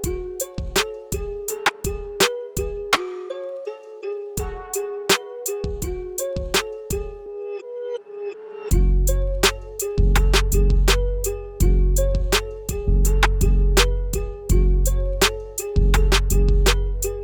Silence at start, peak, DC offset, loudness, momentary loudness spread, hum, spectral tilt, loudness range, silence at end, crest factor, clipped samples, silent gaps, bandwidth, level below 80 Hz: 0 s; -2 dBFS; under 0.1%; -22 LUFS; 12 LU; none; -4 dB/octave; 5 LU; 0 s; 18 dB; under 0.1%; none; over 20 kHz; -22 dBFS